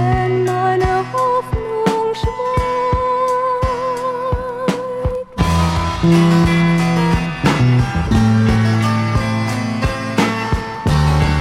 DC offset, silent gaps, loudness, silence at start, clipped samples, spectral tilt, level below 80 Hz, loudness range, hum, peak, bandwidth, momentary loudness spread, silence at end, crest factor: under 0.1%; none; -16 LUFS; 0 s; under 0.1%; -6.5 dB/octave; -28 dBFS; 4 LU; none; 0 dBFS; 14 kHz; 7 LU; 0 s; 14 dB